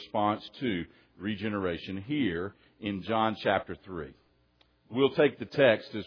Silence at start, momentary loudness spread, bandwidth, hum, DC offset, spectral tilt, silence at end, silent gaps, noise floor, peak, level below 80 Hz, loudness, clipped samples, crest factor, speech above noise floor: 0 s; 16 LU; 5.4 kHz; none; under 0.1%; -8 dB/octave; 0 s; none; -67 dBFS; -10 dBFS; -62 dBFS; -30 LUFS; under 0.1%; 20 dB; 37 dB